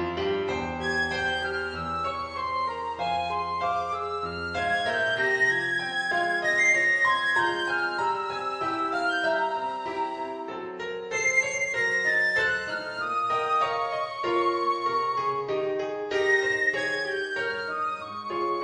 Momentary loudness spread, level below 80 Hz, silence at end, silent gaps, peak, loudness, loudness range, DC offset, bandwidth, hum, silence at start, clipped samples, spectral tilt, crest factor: 9 LU; -58 dBFS; 0 s; none; -12 dBFS; -26 LUFS; 5 LU; under 0.1%; 10 kHz; none; 0 s; under 0.1%; -3 dB/octave; 16 dB